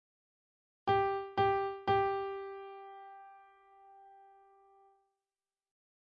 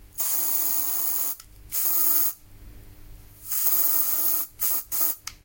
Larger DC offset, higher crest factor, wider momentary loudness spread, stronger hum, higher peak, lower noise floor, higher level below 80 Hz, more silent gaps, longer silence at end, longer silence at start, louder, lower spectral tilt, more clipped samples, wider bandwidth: neither; about the same, 18 dB vs 20 dB; first, 21 LU vs 10 LU; neither; second, -20 dBFS vs -6 dBFS; first, under -90 dBFS vs -45 dBFS; second, -68 dBFS vs -52 dBFS; neither; first, 1.9 s vs 0.1 s; first, 0.85 s vs 0 s; second, -34 LUFS vs -21 LUFS; first, -3.5 dB/octave vs 0 dB/octave; neither; second, 5.6 kHz vs 17 kHz